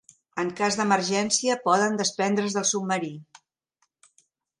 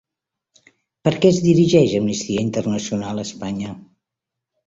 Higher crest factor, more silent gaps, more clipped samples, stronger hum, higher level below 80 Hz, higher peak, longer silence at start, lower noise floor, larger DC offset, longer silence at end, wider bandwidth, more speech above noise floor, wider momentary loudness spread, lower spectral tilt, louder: about the same, 20 dB vs 18 dB; neither; neither; neither; second, -72 dBFS vs -52 dBFS; second, -6 dBFS vs -2 dBFS; second, 0.35 s vs 1.05 s; second, -74 dBFS vs -84 dBFS; neither; first, 1.35 s vs 0.85 s; first, 11.5 kHz vs 8 kHz; second, 49 dB vs 66 dB; second, 9 LU vs 13 LU; second, -3 dB/octave vs -6 dB/octave; second, -24 LUFS vs -19 LUFS